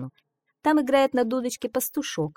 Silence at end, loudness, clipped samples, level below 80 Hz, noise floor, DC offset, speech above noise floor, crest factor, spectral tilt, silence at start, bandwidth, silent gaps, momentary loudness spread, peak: 0.05 s; -24 LUFS; under 0.1%; -64 dBFS; -71 dBFS; under 0.1%; 47 dB; 18 dB; -4.5 dB/octave; 0 s; 18 kHz; none; 8 LU; -8 dBFS